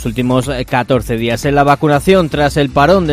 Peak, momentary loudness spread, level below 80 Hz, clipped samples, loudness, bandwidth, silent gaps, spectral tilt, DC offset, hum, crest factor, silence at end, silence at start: 0 dBFS; 5 LU; -30 dBFS; 0.2%; -13 LUFS; 16 kHz; none; -6 dB/octave; under 0.1%; none; 12 dB; 0 s; 0 s